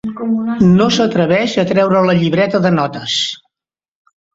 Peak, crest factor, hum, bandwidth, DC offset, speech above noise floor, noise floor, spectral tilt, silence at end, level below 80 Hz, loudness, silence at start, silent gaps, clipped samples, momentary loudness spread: 0 dBFS; 14 dB; none; 7.8 kHz; under 0.1%; 76 dB; -89 dBFS; -6 dB/octave; 1 s; -48 dBFS; -13 LUFS; 0.05 s; none; under 0.1%; 7 LU